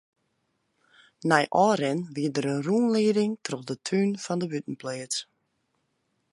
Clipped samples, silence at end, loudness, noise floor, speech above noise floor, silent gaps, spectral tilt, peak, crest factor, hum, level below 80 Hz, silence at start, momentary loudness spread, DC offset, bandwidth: under 0.1%; 1.1 s; -26 LUFS; -75 dBFS; 49 dB; none; -5 dB/octave; -4 dBFS; 24 dB; none; -76 dBFS; 1.25 s; 11 LU; under 0.1%; 11.5 kHz